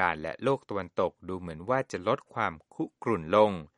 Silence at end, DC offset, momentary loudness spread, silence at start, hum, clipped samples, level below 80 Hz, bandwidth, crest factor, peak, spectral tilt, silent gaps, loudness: 0.15 s; under 0.1%; 13 LU; 0 s; none; under 0.1%; -60 dBFS; 10.5 kHz; 20 dB; -8 dBFS; -6.5 dB/octave; none; -30 LUFS